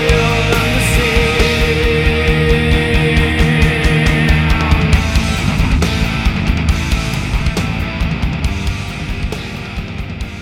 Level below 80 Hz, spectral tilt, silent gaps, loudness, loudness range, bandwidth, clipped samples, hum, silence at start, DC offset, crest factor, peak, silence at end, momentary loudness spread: -18 dBFS; -5.5 dB/octave; none; -14 LUFS; 6 LU; 16.5 kHz; under 0.1%; none; 0 s; under 0.1%; 14 dB; 0 dBFS; 0 s; 10 LU